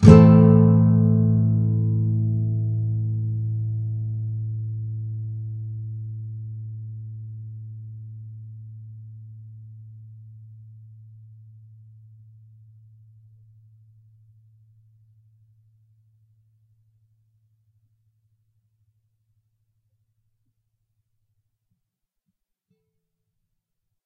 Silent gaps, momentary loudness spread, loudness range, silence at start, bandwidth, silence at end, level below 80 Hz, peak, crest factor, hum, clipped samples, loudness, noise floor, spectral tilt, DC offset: none; 27 LU; 26 LU; 0 s; 6.8 kHz; 13.5 s; -46 dBFS; 0 dBFS; 24 dB; none; under 0.1%; -21 LUFS; -81 dBFS; -10 dB/octave; under 0.1%